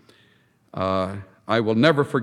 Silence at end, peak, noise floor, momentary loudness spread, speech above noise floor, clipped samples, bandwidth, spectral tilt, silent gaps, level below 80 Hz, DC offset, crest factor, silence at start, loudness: 0 s; -2 dBFS; -60 dBFS; 16 LU; 39 dB; under 0.1%; 12 kHz; -7 dB/octave; none; -66 dBFS; under 0.1%; 20 dB; 0.75 s; -22 LUFS